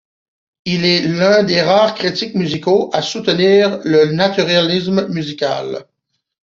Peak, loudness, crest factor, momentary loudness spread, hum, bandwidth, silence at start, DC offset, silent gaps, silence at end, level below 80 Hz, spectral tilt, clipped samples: -2 dBFS; -14 LUFS; 14 dB; 9 LU; none; 7.6 kHz; 0.65 s; under 0.1%; none; 0.6 s; -56 dBFS; -5.5 dB/octave; under 0.1%